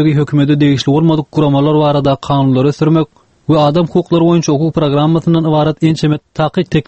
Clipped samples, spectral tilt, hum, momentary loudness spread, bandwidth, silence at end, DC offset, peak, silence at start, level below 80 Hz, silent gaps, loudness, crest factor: under 0.1%; -7.5 dB/octave; none; 4 LU; 8.2 kHz; 0.05 s; under 0.1%; 0 dBFS; 0 s; -42 dBFS; none; -12 LUFS; 10 dB